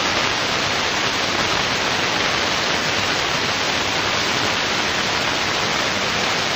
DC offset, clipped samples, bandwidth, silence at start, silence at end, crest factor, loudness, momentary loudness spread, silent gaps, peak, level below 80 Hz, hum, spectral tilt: under 0.1%; under 0.1%; 16 kHz; 0 s; 0 s; 20 dB; -18 LUFS; 1 LU; none; -2 dBFS; -46 dBFS; none; -2 dB/octave